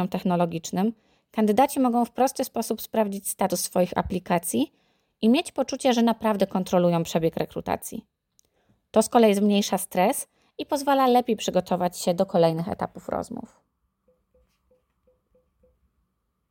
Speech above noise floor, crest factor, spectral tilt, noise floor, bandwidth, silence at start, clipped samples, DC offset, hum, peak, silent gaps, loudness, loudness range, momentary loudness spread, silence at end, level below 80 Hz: 51 dB; 18 dB; -5 dB/octave; -75 dBFS; 17 kHz; 0 s; under 0.1%; under 0.1%; none; -6 dBFS; none; -24 LUFS; 5 LU; 10 LU; 3.05 s; -58 dBFS